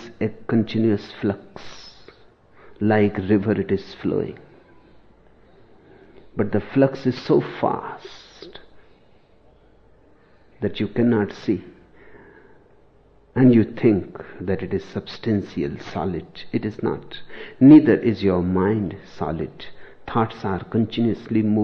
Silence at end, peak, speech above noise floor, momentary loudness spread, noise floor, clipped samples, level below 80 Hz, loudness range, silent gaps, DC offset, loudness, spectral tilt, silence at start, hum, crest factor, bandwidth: 0 s; -2 dBFS; 34 dB; 20 LU; -55 dBFS; under 0.1%; -52 dBFS; 9 LU; none; under 0.1%; -21 LUFS; -9 dB/octave; 0 s; none; 20 dB; 6.4 kHz